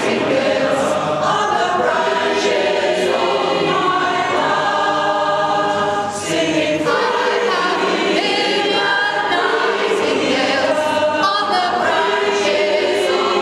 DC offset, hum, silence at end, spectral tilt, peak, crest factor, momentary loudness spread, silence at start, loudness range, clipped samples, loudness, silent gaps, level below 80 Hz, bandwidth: under 0.1%; none; 0 s; -3.5 dB/octave; -2 dBFS; 14 dB; 1 LU; 0 s; 1 LU; under 0.1%; -16 LUFS; none; -56 dBFS; 14 kHz